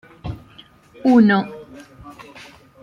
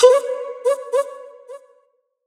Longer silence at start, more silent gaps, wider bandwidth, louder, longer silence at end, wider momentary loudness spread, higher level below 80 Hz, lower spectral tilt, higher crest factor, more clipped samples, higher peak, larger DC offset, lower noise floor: first, 0.25 s vs 0 s; neither; second, 7.2 kHz vs 13 kHz; first, -16 LUFS vs -20 LUFS; about the same, 0.6 s vs 0.7 s; first, 27 LU vs 23 LU; first, -48 dBFS vs -76 dBFS; first, -7.5 dB/octave vs 0.5 dB/octave; about the same, 18 dB vs 20 dB; neither; second, -4 dBFS vs 0 dBFS; neither; second, -48 dBFS vs -63 dBFS